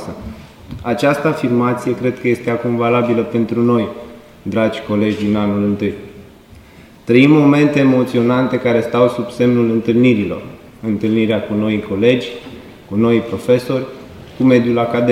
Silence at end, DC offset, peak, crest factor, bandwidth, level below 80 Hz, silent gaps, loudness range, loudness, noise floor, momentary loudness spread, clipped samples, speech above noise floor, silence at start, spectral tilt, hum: 0 s; under 0.1%; 0 dBFS; 16 dB; 14.5 kHz; -48 dBFS; none; 4 LU; -15 LUFS; -41 dBFS; 16 LU; under 0.1%; 27 dB; 0 s; -7.5 dB/octave; none